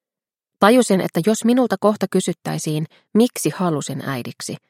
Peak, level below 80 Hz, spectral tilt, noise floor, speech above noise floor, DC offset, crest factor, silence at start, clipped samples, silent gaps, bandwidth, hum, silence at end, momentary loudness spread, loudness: 0 dBFS; -68 dBFS; -5.5 dB/octave; under -90 dBFS; over 71 dB; under 0.1%; 18 dB; 0.6 s; under 0.1%; none; 16.5 kHz; none; 0.15 s; 11 LU; -19 LUFS